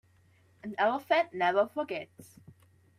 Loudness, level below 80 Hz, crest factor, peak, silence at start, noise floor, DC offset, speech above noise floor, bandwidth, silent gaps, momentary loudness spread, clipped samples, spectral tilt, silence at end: -30 LUFS; -78 dBFS; 18 dB; -14 dBFS; 0.65 s; -64 dBFS; under 0.1%; 34 dB; 15 kHz; none; 16 LU; under 0.1%; -5 dB/octave; 0.75 s